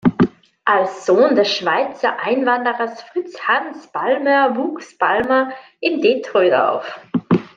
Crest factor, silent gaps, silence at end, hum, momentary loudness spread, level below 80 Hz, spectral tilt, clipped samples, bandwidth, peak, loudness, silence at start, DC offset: 16 dB; none; 0.1 s; none; 10 LU; -56 dBFS; -6 dB/octave; under 0.1%; 7.6 kHz; -2 dBFS; -18 LUFS; 0.05 s; under 0.1%